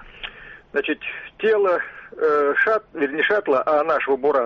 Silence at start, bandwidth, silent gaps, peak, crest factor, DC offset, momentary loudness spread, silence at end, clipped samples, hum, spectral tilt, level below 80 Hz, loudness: 0 s; 6.2 kHz; none; -8 dBFS; 12 dB; under 0.1%; 13 LU; 0 s; under 0.1%; none; -5.5 dB/octave; -56 dBFS; -21 LUFS